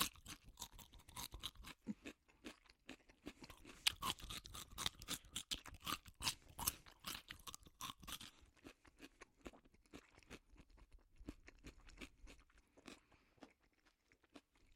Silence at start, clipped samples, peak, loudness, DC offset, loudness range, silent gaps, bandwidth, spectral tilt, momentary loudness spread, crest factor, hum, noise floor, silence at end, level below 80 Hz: 0 s; under 0.1%; -16 dBFS; -48 LUFS; under 0.1%; 17 LU; none; 16.5 kHz; -1.5 dB/octave; 21 LU; 36 dB; none; -78 dBFS; 0 s; -66 dBFS